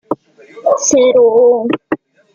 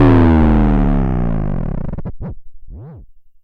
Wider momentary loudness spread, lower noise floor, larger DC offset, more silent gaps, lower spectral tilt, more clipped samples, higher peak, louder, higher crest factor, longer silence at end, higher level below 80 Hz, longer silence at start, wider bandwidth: second, 15 LU vs 23 LU; about the same, -39 dBFS vs -39 dBFS; neither; neither; second, -3 dB/octave vs -10.5 dB/octave; neither; first, -2 dBFS vs -6 dBFS; first, -11 LUFS vs -15 LUFS; about the same, 12 dB vs 10 dB; first, 0.4 s vs 0.25 s; second, -58 dBFS vs -20 dBFS; about the same, 0.1 s vs 0 s; first, 7.4 kHz vs 5 kHz